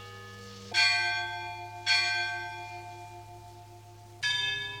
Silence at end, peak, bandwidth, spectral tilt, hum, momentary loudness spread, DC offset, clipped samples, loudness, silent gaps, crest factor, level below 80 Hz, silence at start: 0 s; -12 dBFS; 18 kHz; -1 dB/octave; none; 23 LU; under 0.1%; under 0.1%; -28 LUFS; none; 20 dB; -66 dBFS; 0 s